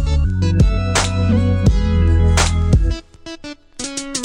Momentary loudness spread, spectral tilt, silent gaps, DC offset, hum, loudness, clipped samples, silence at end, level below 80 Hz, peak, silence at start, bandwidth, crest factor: 17 LU; -5.5 dB/octave; none; under 0.1%; none; -16 LUFS; under 0.1%; 0 s; -20 dBFS; 0 dBFS; 0 s; 11 kHz; 14 dB